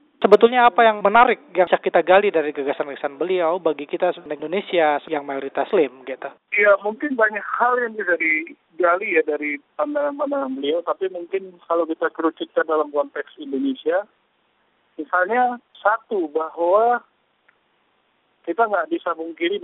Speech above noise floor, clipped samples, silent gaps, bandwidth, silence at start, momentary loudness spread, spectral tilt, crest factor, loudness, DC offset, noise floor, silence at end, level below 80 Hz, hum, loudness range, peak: 45 dB; under 0.1%; none; 4.6 kHz; 0.2 s; 12 LU; -2 dB/octave; 20 dB; -20 LUFS; under 0.1%; -65 dBFS; 0 s; -66 dBFS; none; 6 LU; 0 dBFS